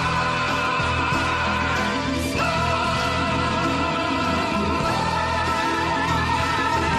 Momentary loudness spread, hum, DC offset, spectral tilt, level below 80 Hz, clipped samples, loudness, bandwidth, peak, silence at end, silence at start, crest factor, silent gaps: 1 LU; none; under 0.1%; -4.5 dB/octave; -38 dBFS; under 0.1%; -22 LUFS; 14 kHz; -10 dBFS; 0 s; 0 s; 12 dB; none